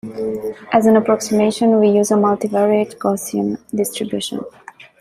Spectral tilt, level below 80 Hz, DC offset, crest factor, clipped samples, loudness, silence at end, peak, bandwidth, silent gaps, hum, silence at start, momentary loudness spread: -5.5 dB/octave; -58 dBFS; under 0.1%; 16 dB; under 0.1%; -17 LUFS; 0.5 s; -2 dBFS; 15 kHz; none; none; 0.05 s; 11 LU